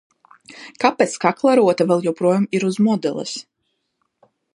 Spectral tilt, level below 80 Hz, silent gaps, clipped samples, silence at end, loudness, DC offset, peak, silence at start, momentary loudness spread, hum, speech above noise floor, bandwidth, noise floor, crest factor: -5.5 dB/octave; -70 dBFS; none; under 0.1%; 1.15 s; -18 LUFS; under 0.1%; 0 dBFS; 0.5 s; 14 LU; none; 55 dB; 11.5 kHz; -73 dBFS; 20 dB